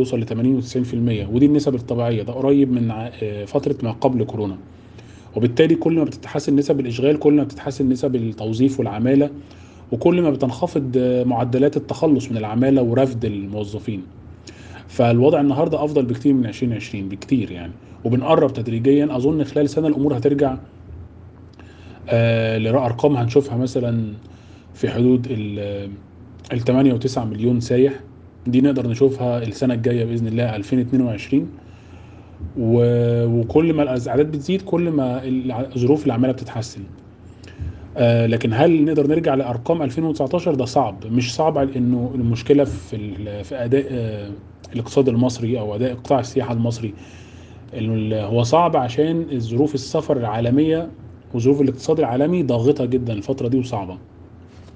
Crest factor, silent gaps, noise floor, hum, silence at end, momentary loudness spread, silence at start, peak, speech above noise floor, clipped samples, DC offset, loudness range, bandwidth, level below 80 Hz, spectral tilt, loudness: 20 dB; none; -42 dBFS; none; 0.05 s; 13 LU; 0 s; 0 dBFS; 23 dB; under 0.1%; under 0.1%; 3 LU; 9 kHz; -50 dBFS; -7.5 dB/octave; -19 LUFS